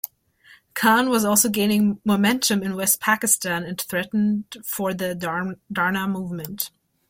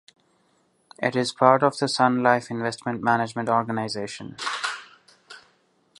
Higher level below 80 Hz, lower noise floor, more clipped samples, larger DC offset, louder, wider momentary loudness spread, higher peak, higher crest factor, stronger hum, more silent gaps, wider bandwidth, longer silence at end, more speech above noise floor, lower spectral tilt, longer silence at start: first, -60 dBFS vs -68 dBFS; second, -54 dBFS vs -66 dBFS; neither; neither; about the same, -21 LUFS vs -23 LUFS; about the same, 11 LU vs 12 LU; about the same, -4 dBFS vs -2 dBFS; about the same, 20 dB vs 24 dB; neither; neither; first, 16.5 kHz vs 11.5 kHz; second, 0.4 s vs 0.6 s; second, 32 dB vs 43 dB; about the same, -3.5 dB/octave vs -4.5 dB/octave; second, 0.05 s vs 1 s